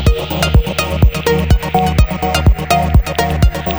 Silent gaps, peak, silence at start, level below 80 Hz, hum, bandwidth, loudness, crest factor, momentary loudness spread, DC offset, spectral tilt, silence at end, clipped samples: none; 0 dBFS; 0 s; -16 dBFS; none; over 20 kHz; -14 LUFS; 12 dB; 3 LU; under 0.1%; -5.5 dB/octave; 0 s; under 0.1%